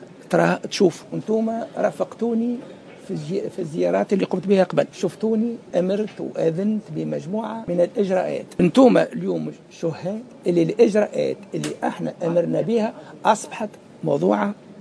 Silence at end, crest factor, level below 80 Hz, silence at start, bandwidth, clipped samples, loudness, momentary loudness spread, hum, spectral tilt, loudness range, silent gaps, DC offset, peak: 0 s; 20 dB; -64 dBFS; 0 s; 11 kHz; under 0.1%; -22 LUFS; 11 LU; none; -6.5 dB/octave; 4 LU; none; under 0.1%; -2 dBFS